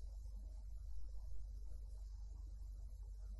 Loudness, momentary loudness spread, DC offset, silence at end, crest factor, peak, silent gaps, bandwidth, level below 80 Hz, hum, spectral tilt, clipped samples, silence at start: -55 LUFS; 1 LU; under 0.1%; 0 s; 12 dB; -36 dBFS; none; 12 kHz; -50 dBFS; none; -6.5 dB/octave; under 0.1%; 0 s